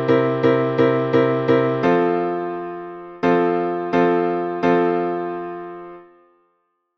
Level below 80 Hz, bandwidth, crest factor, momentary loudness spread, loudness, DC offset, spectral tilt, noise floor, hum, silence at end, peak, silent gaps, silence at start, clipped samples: -60 dBFS; 6.2 kHz; 16 dB; 14 LU; -19 LUFS; under 0.1%; -8.5 dB/octave; -69 dBFS; none; 0.95 s; -4 dBFS; none; 0 s; under 0.1%